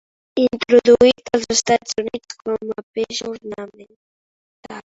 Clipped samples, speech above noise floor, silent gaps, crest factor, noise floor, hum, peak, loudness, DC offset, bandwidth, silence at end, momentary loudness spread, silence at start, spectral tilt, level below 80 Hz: under 0.1%; over 72 dB; 2.83-2.94 s, 3.96-4.63 s; 18 dB; under -90 dBFS; none; -2 dBFS; -18 LUFS; under 0.1%; 8 kHz; 0.05 s; 19 LU; 0.35 s; -3 dB/octave; -54 dBFS